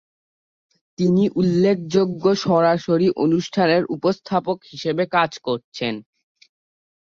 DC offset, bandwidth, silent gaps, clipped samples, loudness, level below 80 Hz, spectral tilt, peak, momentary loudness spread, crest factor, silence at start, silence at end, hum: under 0.1%; 7.4 kHz; 5.64-5.72 s; under 0.1%; -20 LUFS; -60 dBFS; -6.5 dB/octave; -4 dBFS; 9 LU; 16 dB; 1 s; 1.2 s; none